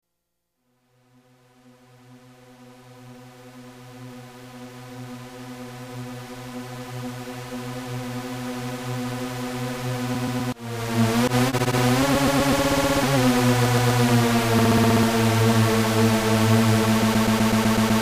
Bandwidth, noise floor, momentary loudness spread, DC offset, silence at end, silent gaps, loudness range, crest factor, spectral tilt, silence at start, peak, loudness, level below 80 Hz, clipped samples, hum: 15.5 kHz; -79 dBFS; 19 LU; under 0.1%; 0 s; none; 20 LU; 16 dB; -5.5 dB/octave; 2.1 s; -6 dBFS; -21 LUFS; -44 dBFS; under 0.1%; none